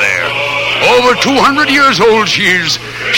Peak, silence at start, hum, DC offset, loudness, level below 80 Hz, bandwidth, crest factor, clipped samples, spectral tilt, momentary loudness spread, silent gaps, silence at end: 0 dBFS; 0 s; none; under 0.1%; -9 LUFS; -44 dBFS; 16.5 kHz; 10 dB; under 0.1%; -3 dB/octave; 5 LU; none; 0 s